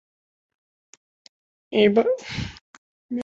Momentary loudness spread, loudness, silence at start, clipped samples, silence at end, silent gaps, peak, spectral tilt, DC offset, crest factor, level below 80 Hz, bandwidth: 15 LU; -22 LUFS; 1.7 s; under 0.1%; 0 s; 2.61-3.09 s; -4 dBFS; -6 dB/octave; under 0.1%; 22 dB; -52 dBFS; 7.8 kHz